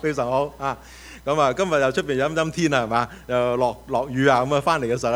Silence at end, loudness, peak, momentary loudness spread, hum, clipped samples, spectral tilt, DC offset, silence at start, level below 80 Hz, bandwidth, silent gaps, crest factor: 0 s; -22 LUFS; -4 dBFS; 8 LU; none; under 0.1%; -5.5 dB/octave; under 0.1%; 0 s; -48 dBFS; 16.5 kHz; none; 18 dB